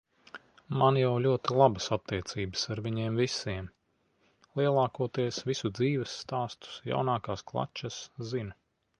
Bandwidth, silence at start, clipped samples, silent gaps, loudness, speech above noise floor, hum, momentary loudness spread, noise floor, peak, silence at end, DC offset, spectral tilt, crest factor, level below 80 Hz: 10.5 kHz; 0.35 s; under 0.1%; none; -31 LUFS; 43 dB; none; 15 LU; -73 dBFS; -8 dBFS; 0.5 s; under 0.1%; -5.5 dB/octave; 22 dB; -58 dBFS